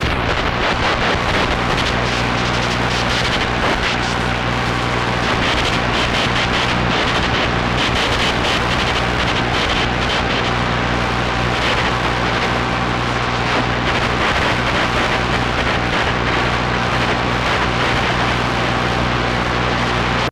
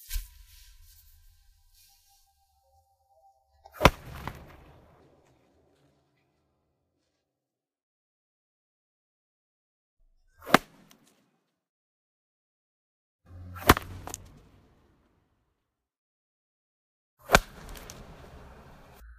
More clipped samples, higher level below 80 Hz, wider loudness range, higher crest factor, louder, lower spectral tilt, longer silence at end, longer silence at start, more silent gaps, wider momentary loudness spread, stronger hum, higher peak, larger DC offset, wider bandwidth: neither; first, -28 dBFS vs -46 dBFS; about the same, 1 LU vs 2 LU; second, 12 dB vs 34 dB; first, -17 LUFS vs -26 LUFS; about the same, -4.5 dB/octave vs -4 dB/octave; second, 0 s vs 1.25 s; about the same, 0 s vs 0.1 s; second, none vs 7.83-9.97 s, 11.69-13.19 s, 15.98-17.17 s; second, 2 LU vs 27 LU; first, 60 Hz at -30 dBFS vs none; second, -4 dBFS vs 0 dBFS; neither; second, 14 kHz vs 15.5 kHz